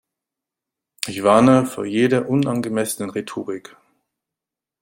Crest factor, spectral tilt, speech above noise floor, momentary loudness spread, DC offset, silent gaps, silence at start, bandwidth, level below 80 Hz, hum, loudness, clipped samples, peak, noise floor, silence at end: 20 dB; -5.5 dB/octave; 69 dB; 15 LU; under 0.1%; none; 1.05 s; 16.5 kHz; -60 dBFS; none; -19 LUFS; under 0.1%; 0 dBFS; -87 dBFS; 1.2 s